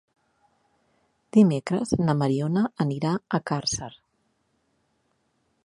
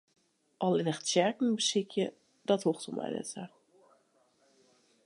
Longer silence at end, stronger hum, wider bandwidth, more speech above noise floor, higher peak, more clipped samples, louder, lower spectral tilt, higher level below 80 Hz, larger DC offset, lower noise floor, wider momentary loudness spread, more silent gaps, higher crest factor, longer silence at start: first, 1.75 s vs 1.6 s; neither; about the same, 11 kHz vs 11.5 kHz; first, 48 dB vs 39 dB; first, -6 dBFS vs -12 dBFS; neither; first, -24 LUFS vs -32 LUFS; first, -6 dB/octave vs -4 dB/octave; first, -58 dBFS vs -82 dBFS; neither; about the same, -71 dBFS vs -70 dBFS; second, 8 LU vs 13 LU; neither; about the same, 20 dB vs 22 dB; first, 1.35 s vs 0.6 s